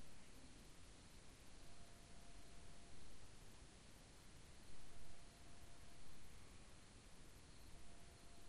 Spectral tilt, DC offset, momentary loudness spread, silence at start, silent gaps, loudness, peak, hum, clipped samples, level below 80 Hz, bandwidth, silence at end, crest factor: -3.5 dB/octave; under 0.1%; 1 LU; 0 s; none; -64 LUFS; -42 dBFS; none; under 0.1%; -66 dBFS; 13 kHz; 0 s; 14 dB